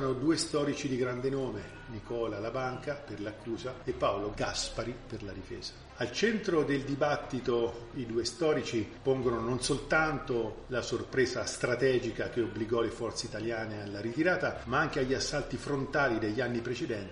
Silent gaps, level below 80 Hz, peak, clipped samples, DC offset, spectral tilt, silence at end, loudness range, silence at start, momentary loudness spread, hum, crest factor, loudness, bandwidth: none; -52 dBFS; -14 dBFS; under 0.1%; under 0.1%; -5 dB/octave; 0 s; 5 LU; 0 s; 10 LU; none; 20 dB; -32 LUFS; 10.5 kHz